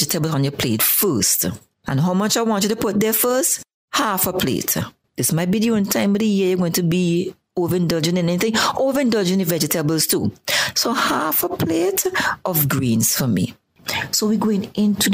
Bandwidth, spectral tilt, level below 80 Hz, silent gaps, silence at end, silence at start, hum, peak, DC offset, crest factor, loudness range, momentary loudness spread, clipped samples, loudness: 16 kHz; -4 dB/octave; -52 dBFS; 3.74-3.88 s; 0 s; 0 s; none; -4 dBFS; under 0.1%; 16 dB; 1 LU; 6 LU; under 0.1%; -19 LUFS